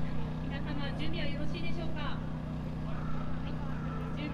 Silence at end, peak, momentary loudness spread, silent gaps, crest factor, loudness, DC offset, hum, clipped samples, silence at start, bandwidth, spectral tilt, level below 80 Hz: 0 s; -20 dBFS; 2 LU; none; 12 dB; -37 LUFS; under 0.1%; none; under 0.1%; 0 s; 7.6 kHz; -7.5 dB/octave; -42 dBFS